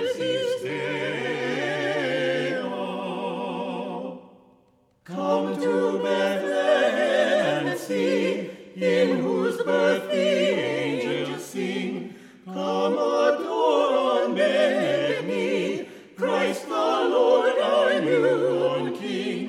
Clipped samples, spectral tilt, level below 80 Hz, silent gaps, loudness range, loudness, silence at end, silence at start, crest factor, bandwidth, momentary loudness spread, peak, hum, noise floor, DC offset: under 0.1%; -5 dB/octave; -74 dBFS; none; 5 LU; -24 LUFS; 0 s; 0 s; 16 dB; 14.5 kHz; 10 LU; -8 dBFS; none; -62 dBFS; under 0.1%